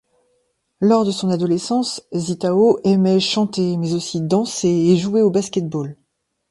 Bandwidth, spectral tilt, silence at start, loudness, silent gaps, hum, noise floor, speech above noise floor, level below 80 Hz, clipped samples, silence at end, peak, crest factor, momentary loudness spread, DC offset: 11.5 kHz; -6 dB/octave; 0.8 s; -18 LUFS; none; none; -67 dBFS; 49 dB; -60 dBFS; under 0.1%; 0.6 s; -2 dBFS; 16 dB; 8 LU; under 0.1%